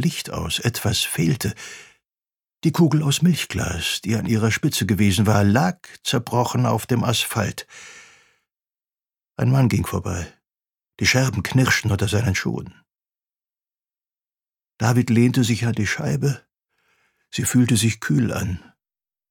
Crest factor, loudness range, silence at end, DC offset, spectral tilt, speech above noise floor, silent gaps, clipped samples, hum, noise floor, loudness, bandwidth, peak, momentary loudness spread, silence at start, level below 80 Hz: 20 dB; 5 LU; 0.75 s; under 0.1%; -5 dB/octave; over 70 dB; none; under 0.1%; none; under -90 dBFS; -21 LUFS; 18.5 kHz; -2 dBFS; 13 LU; 0 s; -48 dBFS